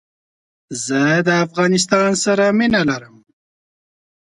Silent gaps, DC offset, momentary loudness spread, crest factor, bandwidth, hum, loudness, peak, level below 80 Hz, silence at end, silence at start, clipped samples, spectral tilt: none; under 0.1%; 9 LU; 18 dB; 11.5 kHz; none; -16 LUFS; 0 dBFS; -56 dBFS; 1.3 s; 0.7 s; under 0.1%; -4.5 dB/octave